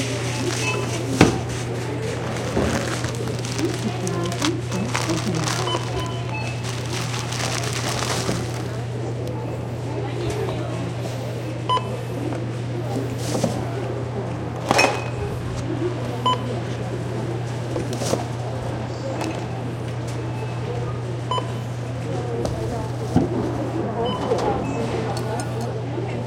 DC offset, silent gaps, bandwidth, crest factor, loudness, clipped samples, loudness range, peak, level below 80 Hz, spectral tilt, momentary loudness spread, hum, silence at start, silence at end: under 0.1%; none; 16.5 kHz; 24 dB; -25 LUFS; under 0.1%; 4 LU; 0 dBFS; -46 dBFS; -5 dB/octave; 6 LU; none; 0 s; 0 s